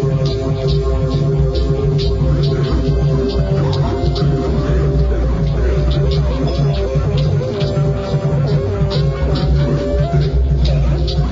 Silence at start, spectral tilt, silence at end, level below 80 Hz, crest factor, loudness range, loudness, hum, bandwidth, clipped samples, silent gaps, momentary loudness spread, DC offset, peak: 0 s; -8 dB/octave; 0 s; -20 dBFS; 12 dB; 1 LU; -16 LUFS; none; 7.6 kHz; under 0.1%; none; 2 LU; 0.2%; -4 dBFS